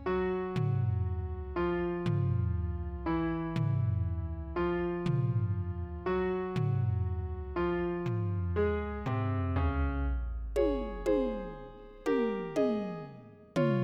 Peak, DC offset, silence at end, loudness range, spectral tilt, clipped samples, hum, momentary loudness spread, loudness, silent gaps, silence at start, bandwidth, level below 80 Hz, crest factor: -18 dBFS; under 0.1%; 0 s; 1 LU; -9 dB/octave; under 0.1%; none; 7 LU; -33 LUFS; none; 0 s; 8.8 kHz; -42 dBFS; 14 dB